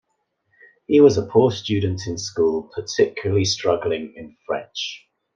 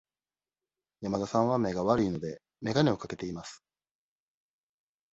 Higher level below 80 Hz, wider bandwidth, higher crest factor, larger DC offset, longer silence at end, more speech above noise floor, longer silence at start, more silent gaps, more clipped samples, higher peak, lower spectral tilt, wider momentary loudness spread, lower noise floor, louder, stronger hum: about the same, -58 dBFS vs -60 dBFS; about the same, 7.6 kHz vs 8.2 kHz; about the same, 18 dB vs 22 dB; neither; second, 0.4 s vs 1.55 s; second, 52 dB vs over 61 dB; about the same, 0.9 s vs 1 s; neither; neither; first, -2 dBFS vs -10 dBFS; about the same, -5.5 dB/octave vs -6.5 dB/octave; about the same, 14 LU vs 13 LU; second, -72 dBFS vs under -90 dBFS; first, -21 LUFS vs -30 LUFS; neither